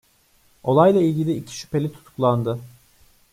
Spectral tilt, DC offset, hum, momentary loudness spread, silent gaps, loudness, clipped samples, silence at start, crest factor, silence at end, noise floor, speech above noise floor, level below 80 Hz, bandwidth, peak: -7.5 dB/octave; under 0.1%; none; 14 LU; none; -21 LUFS; under 0.1%; 0.65 s; 18 dB; 0.65 s; -59 dBFS; 39 dB; -58 dBFS; 16 kHz; -4 dBFS